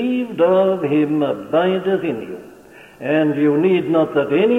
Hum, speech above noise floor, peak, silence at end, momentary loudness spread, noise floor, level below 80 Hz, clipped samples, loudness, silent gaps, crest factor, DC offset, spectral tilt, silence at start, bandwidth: none; 26 dB; -4 dBFS; 0 s; 10 LU; -43 dBFS; -62 dBFS; under 0.1%; -17 LUFS; none; 14 dB; under 0.1%; -8 dB/octave; 0 s; 4 kHz